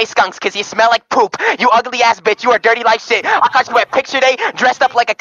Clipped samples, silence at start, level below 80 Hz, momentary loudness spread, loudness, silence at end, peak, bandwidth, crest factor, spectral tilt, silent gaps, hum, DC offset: under 0.1%; 0 s; -62 dBFS; 3 LU; -13 LUFS; 0.1 s; 0 dBFS; 7.6 kHz; 14 dB; -1.5 dB/octave; none; none; under 0.1%